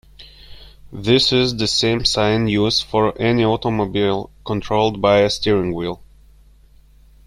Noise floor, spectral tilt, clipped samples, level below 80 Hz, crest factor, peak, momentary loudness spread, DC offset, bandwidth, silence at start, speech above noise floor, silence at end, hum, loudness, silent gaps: -48 dBFS; -5 dB/octave; under 0.1%; -42 dBFS; 18 dB; -2 dBFS; 11 LU; under 0.1%; 13.5 kHz; 0.2 s; 31 dB; 1.2 s; none; -18 LUFS; none